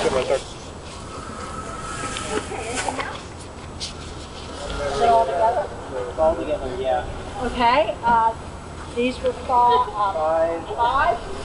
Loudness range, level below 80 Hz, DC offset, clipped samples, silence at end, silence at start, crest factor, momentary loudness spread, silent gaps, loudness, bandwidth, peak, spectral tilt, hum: 8 LU; -40 dBFS; under 0.1%; under 0.1%; 0 s; 0 s; 16 dB; 17 LU; none; -22 LUFS; 11.5 kHz; -6 dBFS; -4 dB/octave; none